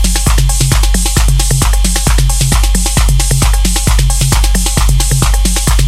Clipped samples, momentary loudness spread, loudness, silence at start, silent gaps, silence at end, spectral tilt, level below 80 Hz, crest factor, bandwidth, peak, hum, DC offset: under 0.1%; 1 LU; -11 LUFS; 0 s; none; 0 s; -3.5 dB/octave; -10 dBFS; 8 dB; 16 kHz; 0 dBFS; none; under 0.1%